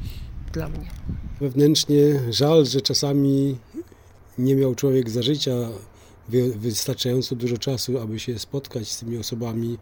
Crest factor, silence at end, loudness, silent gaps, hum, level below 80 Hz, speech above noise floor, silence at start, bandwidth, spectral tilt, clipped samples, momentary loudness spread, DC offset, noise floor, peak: 18 dB; 0 s; -22 LUFS; none; none; -42 dBFS; 27 dB; 0 s; over 20 kHz; -5.5 dB/octave; under 0.1%; 16 LU; under 0.1%; -49 dBFS; -6 dBFS